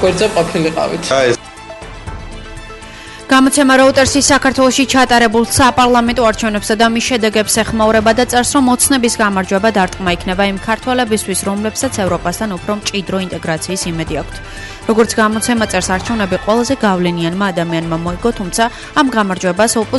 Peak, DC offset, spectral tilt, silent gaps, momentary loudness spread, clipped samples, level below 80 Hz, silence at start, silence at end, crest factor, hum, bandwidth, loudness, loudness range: 0 dBFS; under 0.1%; -3.5 dB/octave; none; 13 LU; under 0.1%; -34 dBFS; 0 s; 0 s; 14 dB; none; 12 kHz; -13 LUFS; 7 LU